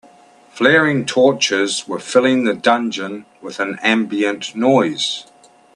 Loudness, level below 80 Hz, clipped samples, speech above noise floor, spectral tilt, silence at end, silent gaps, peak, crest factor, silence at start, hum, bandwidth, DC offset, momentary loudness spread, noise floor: -16 LUFS; -64 dBFS; under 0.1%; 31 dB; -4 dB/octave; 0.55 s; none; 0 dBFS; 18 dB; 0.55 s; none; 11 kHz; under 0.1%; 11 LU; -47 dBFS